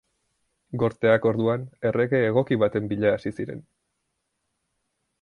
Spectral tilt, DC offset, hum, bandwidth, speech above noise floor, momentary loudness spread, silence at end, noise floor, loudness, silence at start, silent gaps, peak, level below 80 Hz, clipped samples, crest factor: -8.5 dB/octave; under 0.1%; none; 10.5 kHz; 54 dB; 13 LU; 1.6 s; -77 dBFS; -23 LUFS; 0.7 s; none; -6 dBFS; -58 dBFS; under 0.1%; 18 dB